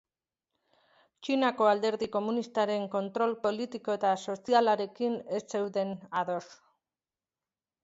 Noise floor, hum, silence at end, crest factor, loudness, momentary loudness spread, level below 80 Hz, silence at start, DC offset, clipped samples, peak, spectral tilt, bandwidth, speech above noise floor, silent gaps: under -90 dBFS; none; 1.3 s; 20 dB; -30 LUFS; 9 LU; -78 dBFS; 1.2 s; under 0.1%; under 0.1%; -12 dBFS; -5 dB/octave; 8 kHz; over 60 dB; none